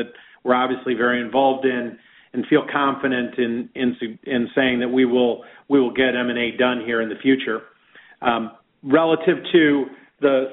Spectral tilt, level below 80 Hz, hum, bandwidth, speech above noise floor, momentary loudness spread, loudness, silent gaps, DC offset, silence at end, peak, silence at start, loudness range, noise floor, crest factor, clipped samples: -3 dB/octave; -62 dBFS; none; 4.1 kHz; 30 dB; 12 LU; -20 LUFS; none; under 0.1%; 0 s; -2 dBFS; 0 s; 2 LU; -50 dBFS; 18 dB; under 0.1%